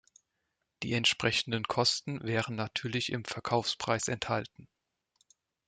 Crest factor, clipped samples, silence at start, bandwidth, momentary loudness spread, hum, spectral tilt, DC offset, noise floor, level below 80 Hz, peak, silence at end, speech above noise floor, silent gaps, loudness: 22 dB; under 0.1%; 0.8 s; 9.6 kHz; 7 LU; none; -3.5 dB/octave; under 0.1%; -83 dBFS; -66 dBFS; -12 dBFS; 1.05 s; 51 dB; none; -31 LUFS